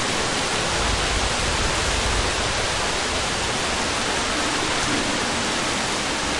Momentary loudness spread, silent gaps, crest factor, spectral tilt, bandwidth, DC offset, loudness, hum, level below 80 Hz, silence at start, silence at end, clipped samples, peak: 1 LU; none; 14 dB; -2.5 dB/octave; 11.5 kHz; under 0.1%; -21 LUFS; none; -34 dBFS; 0 s; 0 s; under 0.1%; -10 dBFS